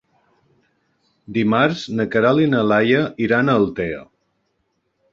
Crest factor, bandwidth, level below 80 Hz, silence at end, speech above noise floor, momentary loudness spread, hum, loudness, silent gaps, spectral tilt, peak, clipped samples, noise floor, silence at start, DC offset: 18 dB; 7.4 kHz; -54 dBFS; 1.1 s; 52 dB; 10 LU; none; -18 LUFS; none; -7 dB/octave; -2 dBFS; under 0.1%; -70 dBFS; 1.3 s; under 0.1%